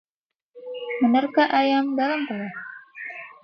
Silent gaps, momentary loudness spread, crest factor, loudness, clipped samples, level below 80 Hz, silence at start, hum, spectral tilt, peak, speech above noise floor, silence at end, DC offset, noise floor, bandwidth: none; 18 LU; 16 dB; -22 LUFS; under 0.1%; -74 dBFS; 0.55 s; none; -6.5 dB/octave; -8 dBFS; 64 dB; 0.1 s; under 0.1%; -85 dBFS; 6.2 kHz